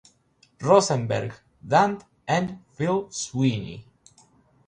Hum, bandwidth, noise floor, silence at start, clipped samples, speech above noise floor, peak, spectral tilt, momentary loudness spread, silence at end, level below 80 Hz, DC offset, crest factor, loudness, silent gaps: none; 10.5 kHz; -62 dBFS; 0.6 s; under 0.1%; 39 dB; -4 dBFS; -5.5 dB/octave; 17 LU; 0.85 s; -60 dBFS; under 0.1%; 22 dB; -24 LUFS; none